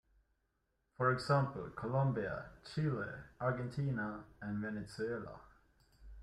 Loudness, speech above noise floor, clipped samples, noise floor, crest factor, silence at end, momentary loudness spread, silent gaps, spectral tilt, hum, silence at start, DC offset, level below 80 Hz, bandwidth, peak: -39 LUFS; 44 dB; under 0.1%; -82 dBFS; 20 dB; 0 s; 11 LU; none; -7.5 dB/octave; none; 1 s; under 0.1%; -62 dBFS; 11 kHz; -20 dBFS